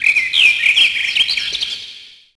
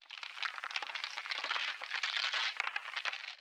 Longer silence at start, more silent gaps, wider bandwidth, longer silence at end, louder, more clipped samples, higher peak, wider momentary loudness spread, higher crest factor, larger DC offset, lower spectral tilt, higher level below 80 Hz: about the same, 0 s vs 0 s; neither; second, 11 kHz vs over 20 kHz; first, 0.3 s vs 0 s; first, -12 LUFS vs -37 LUFS; neither; first, 0 dBFS vs -16 dBFS; first, 13 LU vs 6 LU; second, 16 dB vs 22 dB; neither; first, 2 dB/octave vs 4 dB/octave; first, -54 dBFS vs under -90 dBFS